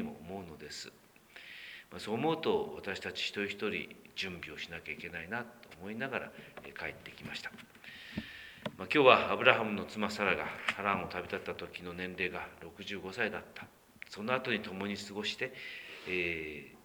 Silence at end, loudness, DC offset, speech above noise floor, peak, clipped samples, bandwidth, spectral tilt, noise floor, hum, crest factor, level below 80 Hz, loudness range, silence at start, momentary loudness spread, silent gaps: 0.05 s; -35 LUFS; under 0.1%; 21 dB; -6 dBFS; under 0.1%; over 20 kHz; -4.5 dB/octave; -56 dBFS; none; 30 dB; -68 dBFS; 12 LU; 0 s; 16 LU; none